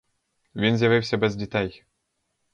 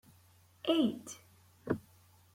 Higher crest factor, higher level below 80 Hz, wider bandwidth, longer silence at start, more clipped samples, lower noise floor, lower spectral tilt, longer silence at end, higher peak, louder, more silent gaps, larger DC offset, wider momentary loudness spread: about the same, 18 dB vs 22 dB; first, -54 dBFS vs -70 dBFS; second, 7.8 kHz vs 16.5 kHz; about the same, 0.55 s vs 0.65 s; neither; first, -76 dBFS vs -64 dBFS; first, -6.5 dB/octave vs -5 dB/octave; first, 0.8 s vs 0.55 s; first, -8 dBFS vs -16 dBFS; first, -23 LUFS vs -35 LUFS; neither; neither; second, 10 LU vs 20 LU